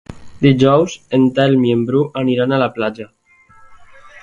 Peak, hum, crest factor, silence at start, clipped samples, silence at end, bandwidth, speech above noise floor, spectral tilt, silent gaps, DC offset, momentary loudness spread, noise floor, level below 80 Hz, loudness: 0 dBFS; none; 16 dB; 0.1 s; under 0.1%; 0.05 s; 7.4 kHz; 32 dB; -7 dB/octave; none; under 0.1%; 10 LU; -46 dBFS; -50 dBFS; -15 LUFS